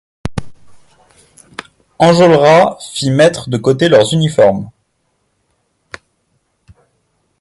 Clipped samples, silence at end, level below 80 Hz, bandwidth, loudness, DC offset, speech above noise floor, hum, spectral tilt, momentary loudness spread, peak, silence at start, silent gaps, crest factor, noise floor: under 0.1%; 2.7 s; -44 dBFS; 11.5 kHz; -11 LUFS; under 0.1%; 54 dB; none; -5.5 dB/octave; 25 LU; 0 dBFS; 0.25 s; none; 14 dB; -64 dBFS